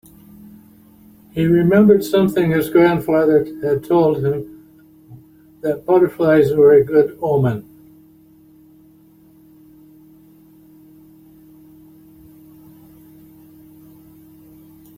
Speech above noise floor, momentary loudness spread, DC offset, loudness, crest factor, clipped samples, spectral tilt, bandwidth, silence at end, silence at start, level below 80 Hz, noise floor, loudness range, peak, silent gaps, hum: 35 dB; 12 LU; under 0.1%; -15 LUFS; 18 dB; under 0.1%; -8 dB/octave; 16 kHz; 7.35 s; 1.35 s; -52 dBFS; -49 dBFS; 6 LU; -2 dBFS; none; none